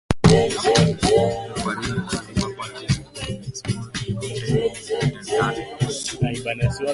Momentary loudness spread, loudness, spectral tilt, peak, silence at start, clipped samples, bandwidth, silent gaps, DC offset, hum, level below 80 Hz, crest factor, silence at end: 11 LU; -22 LUFS; -5 dB/octave; 0 dBFS; 0.1 s; under 0.1%; 11.5 kHz; none; under 0.1%; none; -40 dBFS; 22 dB; 0 s